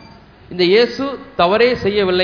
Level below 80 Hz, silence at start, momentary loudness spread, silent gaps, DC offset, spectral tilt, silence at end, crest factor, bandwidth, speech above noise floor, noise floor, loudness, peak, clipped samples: -46 dBFS; 0.5 s; 11 LU; none; under 0.1%; -6 dB/octave; 0 s; 16 dB; 5.4 kHz; 27 dB; -42 dBFS; -15 LUFS; 0 dBFS; under 0.1%